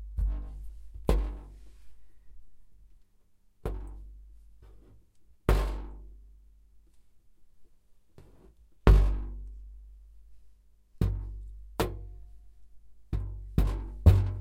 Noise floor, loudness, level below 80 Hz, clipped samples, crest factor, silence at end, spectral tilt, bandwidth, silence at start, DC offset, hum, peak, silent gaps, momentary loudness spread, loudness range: -62 dBFS; -30 LUFS; -34 dBFS; under 0.1%; 26 dB; 0 s; -7.5 dB/octave; 16 kHz; 0 s; under 0.1%; none; -4 dBFS; none; 26 LU; 16 LU